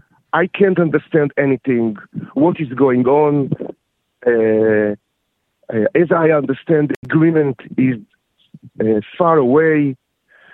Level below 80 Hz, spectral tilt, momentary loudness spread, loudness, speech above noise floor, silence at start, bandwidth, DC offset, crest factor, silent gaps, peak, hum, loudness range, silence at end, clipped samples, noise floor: -60 dBFS; -10.5 dB/octave; 9 LU; -16 LUFS; 55 dB; 0.35 s; 4 kHz; under 0.1%; 16 dB; 6.96-7.03 s; 0 dBFS; none; 1 LU; 0.6 s; under 0.1%; -70 dBFS